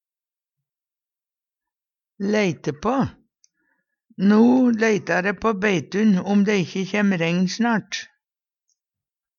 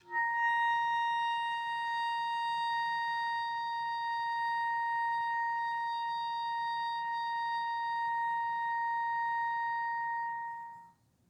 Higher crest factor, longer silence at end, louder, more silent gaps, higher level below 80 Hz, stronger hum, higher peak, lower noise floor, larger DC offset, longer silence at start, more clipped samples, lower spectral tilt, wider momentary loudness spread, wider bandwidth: first, 16 dB vs 10 dB; first, 1.35 s vs 0.4 s; first, -20 LUFS vs -33 LUFS; neither; first, -58 dBFS vs -84 dBFS; neither; first, -6 dBFS vs -24 dBFS; first, under -90 dBFS vs -60 dBFS; neither; first, 2.2 s vs 0.05 s; neither; first, -6 dB/octave vs -0.5 dB/octave; first, 9 LU vs 5 LU; second, 7.2 kHz vs 9.8 kHz